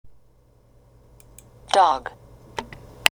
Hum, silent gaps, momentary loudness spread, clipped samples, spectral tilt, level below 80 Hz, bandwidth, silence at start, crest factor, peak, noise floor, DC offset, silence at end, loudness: none; none; 20 LU; under 0.1%; -1.5 dB/octave; -52 dBFS; over 20 kHz; 0.05 s; 26 dB; 0 dBFS; -56 dBFS; under 0.1%; 0.05 s; -22 LUFS